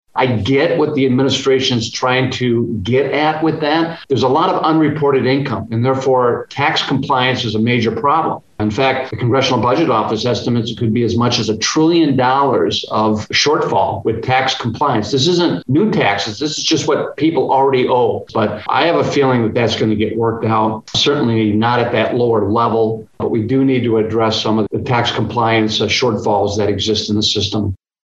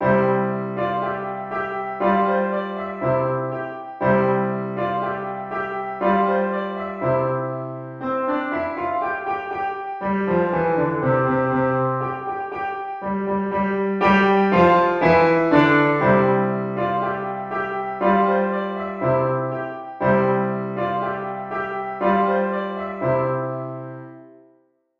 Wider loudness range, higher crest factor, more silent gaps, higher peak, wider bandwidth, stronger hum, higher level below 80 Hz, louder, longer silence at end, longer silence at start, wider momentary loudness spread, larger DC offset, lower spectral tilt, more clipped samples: second, 1 LU vs 7 LU; about the same, 14 dB vs 18 dB; neither; about the same, 0 dBFS vs -2 dBFS; first, 8.2 kHz vs 6.6 kHz; neither; about the same, -54 dBFS vs -54 dBFS; first, -15 LUFS vs -21 LUFS; second, 0.3 s vs 0.7 s; first, 0.15 s vs 0 s; second, 4 LU vs 11 LU; neither; second, -5 dB/octave vs -9 dB/octave; neither